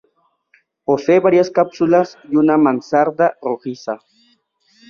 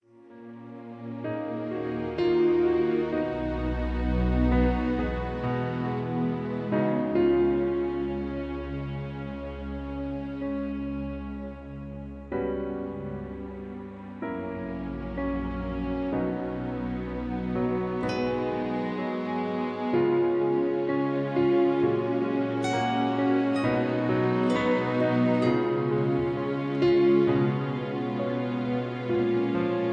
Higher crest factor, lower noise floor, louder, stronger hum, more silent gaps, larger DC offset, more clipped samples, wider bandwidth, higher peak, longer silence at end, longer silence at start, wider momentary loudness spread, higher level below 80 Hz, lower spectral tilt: about the same, 14 dB vs 16 dB; first, -62 dBFS vs -48 dBFS; first, -16 LUFS vs -28 LUFS; neither; neither; neither; neither; second, 7 kHz vs 8.6 kHz; first, -2 dBFS vs -12 dBFS; first, 0.95 s vs 0 s; first, 0.9 s vs 0.2 s; about the same, 14 LU vs 12 LU; second, -62 dBFS vs -40 dBFS; about the same, -7 dB/octave vs -8 dB/octave